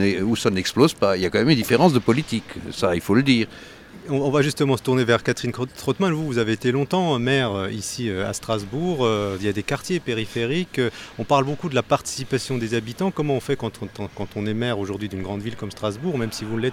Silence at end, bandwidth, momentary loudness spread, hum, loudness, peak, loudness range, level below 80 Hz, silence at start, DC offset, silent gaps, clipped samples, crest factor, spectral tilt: 0 s; 17 kHz; 10 LU; none; -22 LUFS; -2 dBFS; 6 LU; -52 dBFS; 0 s; under 0.1%; none; under 0.1%; 20 dB; -5.5 dB/octave